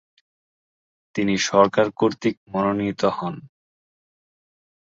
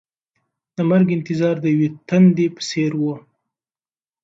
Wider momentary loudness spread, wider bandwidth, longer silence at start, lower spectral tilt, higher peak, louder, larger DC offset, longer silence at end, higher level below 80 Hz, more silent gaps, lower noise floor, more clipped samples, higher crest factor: first, 13 LU vs 10 LU; about the same, 7.8 kHz vs 7.8 kHz; first, 1.15 s vs 0.8 s; second, -5 dB/octave vs -7 dB/octave; about the same, -2 dBFS vs -4 dBFS; second, -22 LUFS vs -18 LUFS; neither; first, 1.4 s vs 1.05 s; about the same, -60 dBFS vs -64 dBFS; first, 2.37-2.46 s vs none; about the same, under -90 dBFS vs under -90 dBFS; neither; first, 22 dB vs 16 dB